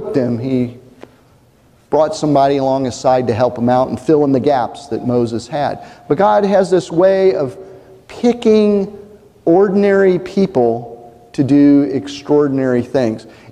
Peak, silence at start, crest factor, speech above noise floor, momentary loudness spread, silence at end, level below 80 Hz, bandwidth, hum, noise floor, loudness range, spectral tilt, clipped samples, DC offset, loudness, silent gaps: -2 dBFS; 0 s; 14 dB; 36 dB; 10 LU; 0.2 s; -50 dBFS; 10 kHz; none; -50 dBFS; 2 LU; -7 dB/octave; under 0.1%; under 0.1%; -14 LUFS; none